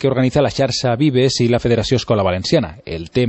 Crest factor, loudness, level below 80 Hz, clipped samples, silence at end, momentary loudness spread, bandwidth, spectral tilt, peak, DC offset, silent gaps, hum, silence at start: 14 dB; -16 LUFS; -40 dBFS; under 0.1%; 0 s; 4 LU; 8.4 kHz; -6 dB/octave; -2 dBFS; under 0.1%; none; none; 0 s